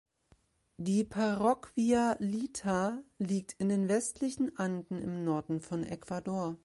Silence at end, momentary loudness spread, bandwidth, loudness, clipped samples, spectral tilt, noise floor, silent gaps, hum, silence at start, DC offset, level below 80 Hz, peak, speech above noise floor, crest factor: 0.1 s; 9 LU; 11.5 kHz; -33 LUFS; under 0.1%; -6 dB/octave; -69 dBFS; none; none; 0.8 s; under 0.1%; -64 dBFS; -16 dBFS; 37 dB; 18 dB